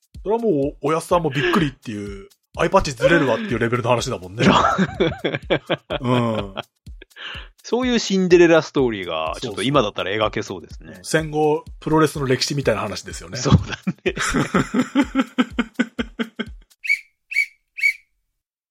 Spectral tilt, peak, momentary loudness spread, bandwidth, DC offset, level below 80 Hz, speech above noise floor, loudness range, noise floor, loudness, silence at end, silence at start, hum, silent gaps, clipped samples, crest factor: -5 dB/octave; -2 dBFS; 15 LU; 16 kHz; under 0.1%; -42 dBFS; 57 dB; 4 LU; -77 dBFS; -20 LUFS; 0.75 s; 0.15 s; none; none; under 0.1%; 20 dB